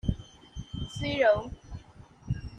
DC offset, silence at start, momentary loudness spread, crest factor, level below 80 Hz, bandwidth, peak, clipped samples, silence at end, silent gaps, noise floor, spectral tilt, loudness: under 0.1%; 0.05 s; 22 LU; 20 dB; -44 dBFS; 9.8 kHz; -12 dBFS; under 0.1%; 0 s; none; -52 dBFS; -6 dB/octave; -29 LUFS